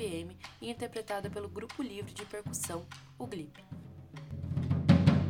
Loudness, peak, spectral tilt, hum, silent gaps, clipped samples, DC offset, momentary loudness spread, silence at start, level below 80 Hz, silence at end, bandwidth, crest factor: -35 LUFS; -10 dBFS; -6 dB/octave; none; none; under 0.1%; under 0.1%; 20 LU; 0 s; -58 dBFS; 0 s; 18.5 kHz; 24 dB